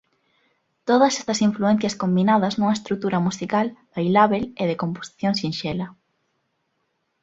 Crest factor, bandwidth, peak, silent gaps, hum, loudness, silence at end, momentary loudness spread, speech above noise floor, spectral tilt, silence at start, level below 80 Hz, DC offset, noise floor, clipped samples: 20 dB; 8 kHz; -2 dBFS; none; none; -22 LUFS; 1.3 s; 10 LU; 52 dB; -5.5 dB/octave; 0.85 s; -60 dBFS; under 0.1%; -73 dBFS; under 0.1%